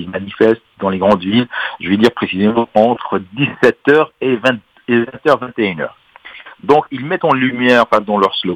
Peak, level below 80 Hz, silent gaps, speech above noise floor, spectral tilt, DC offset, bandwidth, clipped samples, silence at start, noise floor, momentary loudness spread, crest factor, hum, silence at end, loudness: 0 dBFS; -54 dBFS; none; 23 dB; -6.5 dB/octave; under 0.1%; 11 kHz; under 0.1%; 0 s; -37 dBFS; 9 LU; 14 dB; none; 0 s; -14 LUFS